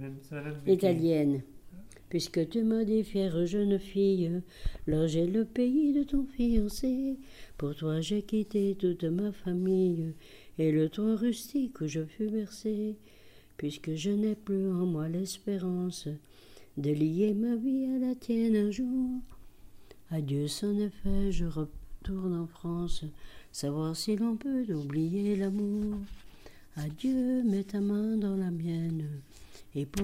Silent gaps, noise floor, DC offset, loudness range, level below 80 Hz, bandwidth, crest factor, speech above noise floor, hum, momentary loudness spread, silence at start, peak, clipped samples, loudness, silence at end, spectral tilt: none; -51 dBFS; under 0.1%; 5 LU; -46 dBFS; 16 kHz; 16 dB; 21 dB; none; 12 LU; 0 s; -14 dBFS; under 0.1%; -31 LUFS; 0 s; -7 dB/octave